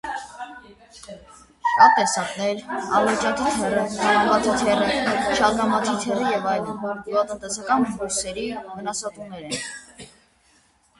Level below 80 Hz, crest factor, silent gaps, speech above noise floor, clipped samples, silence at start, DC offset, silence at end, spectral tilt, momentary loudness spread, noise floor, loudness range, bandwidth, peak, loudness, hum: -54 dBFS; 22 dB; none; 38 dB; under 0.1%; 0.05 s; under 0.1%; 0.95 s; -3 dB/octave; 15 LU; -60 dBFS; 7 LU; 11.5 kHz; 0 dBFS; -22 LUFS; none